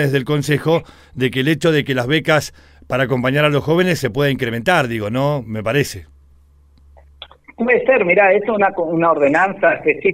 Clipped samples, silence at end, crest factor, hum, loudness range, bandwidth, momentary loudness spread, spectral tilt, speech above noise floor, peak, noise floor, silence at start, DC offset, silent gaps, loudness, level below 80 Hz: under 0.1%; 0 s; 16 dB; none; 5 LU; 16 kHz; 7 LU; -6 dB/octave; 33 dB; -2 dBFS; -49 dBFS; 0 s; under 0.1%; none; -16 LUFS; -48 dBFS